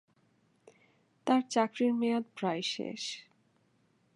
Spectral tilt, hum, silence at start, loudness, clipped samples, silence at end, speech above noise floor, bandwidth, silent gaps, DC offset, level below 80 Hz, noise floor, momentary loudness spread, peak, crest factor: -4.5 dB/octave; none; 1.25 s; -32 LUFS; under 0.1%; 0.95 s; 40 dB; 11.5 kHz; none; under 0.1%; -86 dBFS; -71 dBFS; 11 LU; -14 dBFS; 20 dB